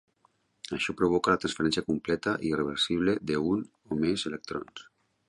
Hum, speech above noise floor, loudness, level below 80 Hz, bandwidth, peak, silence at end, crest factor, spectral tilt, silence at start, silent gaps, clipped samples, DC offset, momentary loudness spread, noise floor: none; 41 dB; -29 LUFS; -56 dBFS; 11.5 kHz; -10 dBFS; 0.45 s; 20 dB; -5 dB/octave; 0.7 s; none; under 0.1%; under 0.1%; 12 LU; -69 dBFS